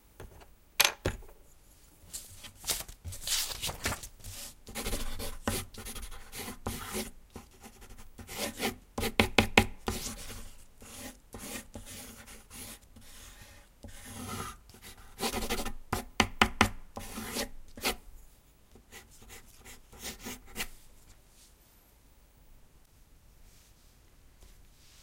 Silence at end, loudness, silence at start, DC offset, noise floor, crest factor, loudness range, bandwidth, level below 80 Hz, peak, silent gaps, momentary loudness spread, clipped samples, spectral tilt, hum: 0 s; -34 LUFS; 0.05 s; under 0.1%; -61 dBFS; 34 dB; 14 LU; 16.5 kHz; -46 dBFS; -2 dBFS; none; 25 LU; under 0.1%; -2.5 dB/octave; none